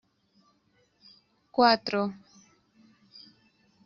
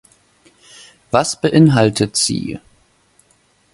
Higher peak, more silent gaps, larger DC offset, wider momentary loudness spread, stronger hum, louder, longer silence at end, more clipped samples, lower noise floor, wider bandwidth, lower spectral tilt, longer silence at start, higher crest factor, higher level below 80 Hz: second, -8 dBFS vs 0 dBFS; neither; neither; first, 29 LU vs 14 LU; neither; second, -26 LUFS vs -15 LUFS; first, 1.75 s vs 1.15 s; neither; first, -69 dBFS vs -57 dBFS; second, 7 kHz vs 11.5 kHz; second, -2 dB/octave vs -5 dB/octave; first, 1.55 s vs 1.15 s; first, 24 dB vs 18 dB; second, -72 dBFS vs -50 dBFS